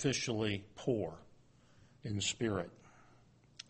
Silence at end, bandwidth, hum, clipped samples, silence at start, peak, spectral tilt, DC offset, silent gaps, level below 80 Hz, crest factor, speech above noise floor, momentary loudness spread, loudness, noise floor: 0.8 s; 8.4 kHz; none; under 0.1%; 0 s; -20 dBFS; -4 dB/octave; under 0.1%; none; -66 dBFS; 20 dB; 28 dB; 13 LU; -38 LUFS; -65 dBFS